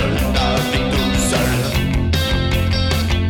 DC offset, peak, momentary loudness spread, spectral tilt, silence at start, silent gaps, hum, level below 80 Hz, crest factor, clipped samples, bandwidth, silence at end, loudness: under 0.1%; -6 dBFS; 1 LU; -5 dB/octave; 0 s; none; none; -22 dBFS; 10 dB; under 0.1%; 18.5 kHz; 0 s; -17 LUFS